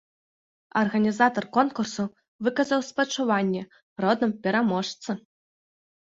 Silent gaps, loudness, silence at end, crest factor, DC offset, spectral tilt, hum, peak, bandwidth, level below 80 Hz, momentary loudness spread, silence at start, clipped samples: 2.28-2.39 s, 3.82-3.96 s; -25 LUFS; 0.85 s; 20 dB; under 0.1%; -5 dB/octave; none; -6 dBFS; 8 kHz; -70 dBFS; 11 LU; 0.75 s; under 0.1%